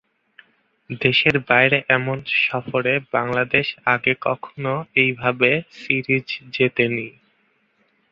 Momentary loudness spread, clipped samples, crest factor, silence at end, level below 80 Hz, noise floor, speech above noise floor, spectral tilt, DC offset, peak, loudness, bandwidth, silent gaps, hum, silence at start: 10 LU; under 0.1%; 20 dB; 1 s; -58 dBFS; -64 dBFS; 44 dB; -7 dB/octave; under 0.1%; 0 dBFS; -19 LUFS; 7.2 kHz; none; none; 0.9 s